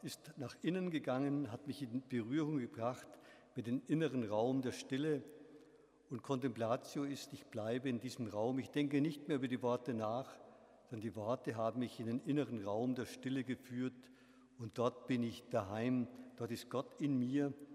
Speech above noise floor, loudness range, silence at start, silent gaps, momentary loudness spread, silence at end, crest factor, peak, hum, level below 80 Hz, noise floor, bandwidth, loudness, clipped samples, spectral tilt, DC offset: 25 dB; 2 LU; 0 s; none; 11 LU; 0 s; 18 dB; -22 dBFS; none; -84 dBFS; -66 dBFS; 15 kHz; -41 LUFS; under 0.1%; -6.5 dB/octave; under 0.1%